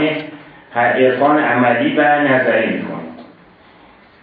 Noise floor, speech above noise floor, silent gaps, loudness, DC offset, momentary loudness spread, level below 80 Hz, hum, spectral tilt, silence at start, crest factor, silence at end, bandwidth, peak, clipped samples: -45 dBFS; 32 dB; none; -14 LUFS; under 0.1%; 15 LU; -64 dBFS; none; -9.5 dB/octave; 0 s; 16 dB; 1 s; 4.9 kHz; 0 dBFS; under 0.1%